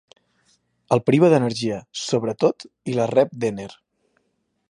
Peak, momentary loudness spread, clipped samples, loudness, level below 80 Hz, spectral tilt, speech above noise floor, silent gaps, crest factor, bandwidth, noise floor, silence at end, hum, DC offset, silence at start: -4 dBFS; 13 LU; under 0.1%; -21 LUFS; -64 dBFS; -6 dB/octave; 51 dB; none; 20 dB; 11 kHz; -72 dBFS; 0.95 s; none; under 0.1%; 0.9 s